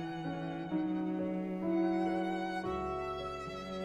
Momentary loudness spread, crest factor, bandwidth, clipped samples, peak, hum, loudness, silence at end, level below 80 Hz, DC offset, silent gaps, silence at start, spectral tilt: 7 LU; 12 dB; 9.4 kHz; under 0.1%; -22 dBFS; none; -36 LUFS; 0 s; -60 dBFS; under 0.1%; none; 0 s; -7.5 dB/octave